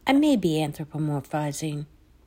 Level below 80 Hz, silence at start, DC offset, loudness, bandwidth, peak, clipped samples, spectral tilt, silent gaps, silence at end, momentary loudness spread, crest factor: -56 dBFS; 0.05 s; under 0.1%; -26 LUFS; 16 kHz; -8 dBFS; under 0.1%; -6 dB/octave; none; 0.4 s; 13 LU; 18 dB